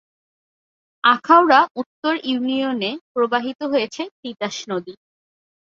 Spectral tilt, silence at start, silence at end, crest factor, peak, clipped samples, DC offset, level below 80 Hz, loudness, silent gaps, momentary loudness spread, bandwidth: -4 dB/octave; 1.05 s; 0.85 s; 20 dB; 0 dBFS; under 0.1%; under 0.1%; -70 dBFS; -19 LUFS; 1.71-1.75 s, 1.86-2.02 s, 3.01-3.15 s, 3.55-3.59 s, 4.11-4.23 s; 15 LU; 7.6 kHz